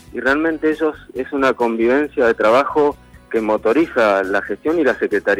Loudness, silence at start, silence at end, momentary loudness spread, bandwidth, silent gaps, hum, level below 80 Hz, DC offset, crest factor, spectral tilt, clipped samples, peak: -17 LUFS; 0.15 s; 0 s; 7 LU; 14 kHz; none; none; -48 dBFS; under 0.1%; 12 dB; -5.5 dB/octave; under 0.1%; -4 dBFS